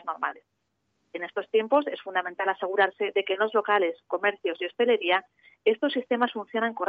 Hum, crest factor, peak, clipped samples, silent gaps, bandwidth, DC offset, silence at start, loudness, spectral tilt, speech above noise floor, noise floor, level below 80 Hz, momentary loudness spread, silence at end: none; 18 dB; -10 dBFS; under 0.1%; none; 4.9 kHz; under 0.1%; 0.05 s; -26 LUFS; -6 dB/octave; 49 dB; -76 dBFS; -82 dBFS; 8 LU; 0 s